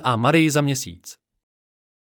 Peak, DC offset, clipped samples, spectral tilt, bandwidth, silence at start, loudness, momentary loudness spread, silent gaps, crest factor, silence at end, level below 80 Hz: -6 dBFS; under 0.1%; under 0.1%; -5 dB/octave; 18 kHz; 0 s; -19 LUFS; 17 LU; none; 16 dB; 1 s; -64 dBFS